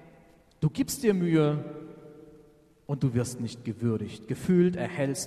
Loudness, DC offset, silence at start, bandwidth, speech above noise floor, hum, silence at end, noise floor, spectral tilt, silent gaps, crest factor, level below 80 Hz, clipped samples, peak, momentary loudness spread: -28 LUFS; under 0.1%; 0.6 s; 13.5 kHz; 31 dB; none; 0 s; -58 dBFS; -6.5 dB/octave; none; 18 dB; -58 dBFS; under 0.1%; -12 dBFS; 13 LU